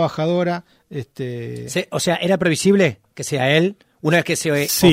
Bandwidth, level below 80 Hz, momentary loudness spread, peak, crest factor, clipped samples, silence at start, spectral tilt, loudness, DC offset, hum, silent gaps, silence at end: 16 kHz; -54 dBFS; 13 LU; -2 dBFS; 18 dB; under 0.1%; 0 s; -4.5 dB/octave; -19 LUFS; under 0.1%; none; none; 0 s